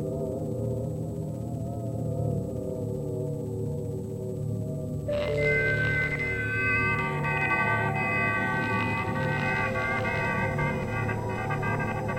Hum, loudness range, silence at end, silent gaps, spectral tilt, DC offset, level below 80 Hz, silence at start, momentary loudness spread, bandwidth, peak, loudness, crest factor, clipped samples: none; 7 LU; 0 s; none; -7 dB/octave; under 0.1%; -46 dBFS; 0 s; 9 LU; 16 kHz; -14 dBFS; -28 LUFS; 16 dB; under 0.1%